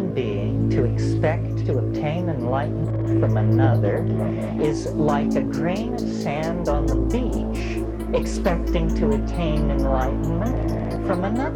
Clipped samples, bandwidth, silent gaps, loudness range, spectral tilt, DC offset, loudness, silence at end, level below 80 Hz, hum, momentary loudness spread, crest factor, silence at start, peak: under 0.1%; 12.5 kHz; none; 2 LU; -8 dB/octave; under 0.1%; -23 LUFS; 0 s; -30 dBFS; none; 5 LU; 14 dB; 0 s; -6 dBFS